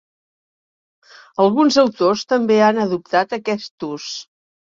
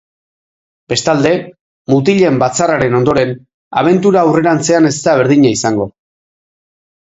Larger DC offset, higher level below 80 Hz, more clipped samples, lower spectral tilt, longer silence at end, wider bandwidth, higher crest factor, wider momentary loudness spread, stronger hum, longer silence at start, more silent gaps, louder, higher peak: neither; second, -64 dBFS vs -48 dBFS; neither; about the same, -5 dB/octave vs -5.5 dB/octave; second, 0.55 s vs 1.15 s; about the same, 7.6 kHz vs 8.2 kHz; first, 18 dB vs 12 dB; first, 14 LU vs 9 LU; neither; first, 1.4 s vs 0.9 s; second, 3.71-3.78 s vs 1.61-1.85 s, 3.54-3.71 s; second, -17 LUFS vs -12 LUFS; about the same, -2 dBFS vs 0 dBFS